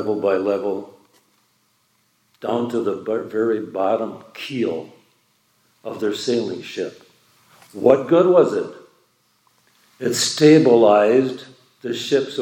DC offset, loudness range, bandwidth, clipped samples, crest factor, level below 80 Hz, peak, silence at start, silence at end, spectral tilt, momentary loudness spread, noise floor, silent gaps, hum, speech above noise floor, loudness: under 0.1%; 9 LU; 17 kHz; under 0.1%; 20 dB; -72 dBFS; 0 dBFS; 0 s; 0 s; -5 dB/octave; 18 LU; -64 dBFS; none; none; 46 dB; -19 LUFS